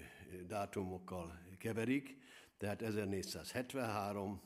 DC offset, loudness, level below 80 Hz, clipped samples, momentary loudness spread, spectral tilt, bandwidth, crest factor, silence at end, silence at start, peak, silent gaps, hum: under 0.1%; -43 LUFS; -74 dBFS; under 0.1%; 14 LU; -5.5 dB/octave; 15.5 kHz; 18 dB; 0 s; 0 s; -26 dBFS; none; none